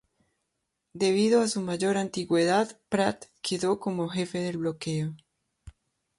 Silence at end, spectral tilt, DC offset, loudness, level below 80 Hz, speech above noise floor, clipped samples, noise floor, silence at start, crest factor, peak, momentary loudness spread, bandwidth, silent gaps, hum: 0.5 s; -5 dB/octave; under 0.1%; -27 LUFS; -64 dBFS; 54 dB; under 0.1%; -81 dBFS; 0.95 s; 18 dB; -10 dBFS; 8 LU; 11.5 kHz; none; none